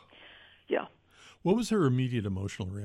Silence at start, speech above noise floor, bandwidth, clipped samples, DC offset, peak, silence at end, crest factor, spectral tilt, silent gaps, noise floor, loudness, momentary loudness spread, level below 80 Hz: 0.2 s; 29 dB; 13 kHz; under 0.1%; under 0.1%; -14 dBFS; 0 s; 18 dB; -7 dB/octave; none; -58 dBFS; -30 LUFS; 9 LU; -62 dBFS